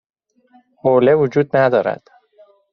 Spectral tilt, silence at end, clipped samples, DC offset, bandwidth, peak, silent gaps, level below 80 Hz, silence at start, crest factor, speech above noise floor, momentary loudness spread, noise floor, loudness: -6 dB/octave; 0.75 s; under 0.1%; under 0.1%; 6.4 kHz; -2 dBFS; none; -60 dBFS; 0.85 s; 16 dB; 40 dB; 10 LU; -54 dBFS; -16 LUFS